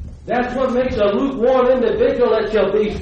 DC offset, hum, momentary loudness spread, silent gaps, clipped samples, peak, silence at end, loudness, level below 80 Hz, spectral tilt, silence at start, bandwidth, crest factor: under 0.1%; none; 5 LU; none; under 0.1%; -4 dBFS; 0 s; -17 LUFS; -38 dBFS; -7 dB/octave; 0 s; 7.4 kHz; 12 dB